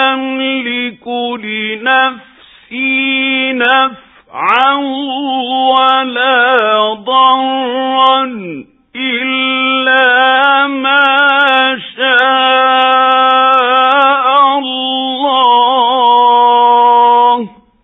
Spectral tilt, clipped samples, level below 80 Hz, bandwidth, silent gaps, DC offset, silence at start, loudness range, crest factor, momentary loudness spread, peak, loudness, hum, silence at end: -5 dB/octave; under 0.1%; -62 dBFS; 4 kHz; none; under 0.1%; 0 s; 4 LU; 10 dB; 10 LU; 0 dBFS; -10 LUFS; none; 0.35 s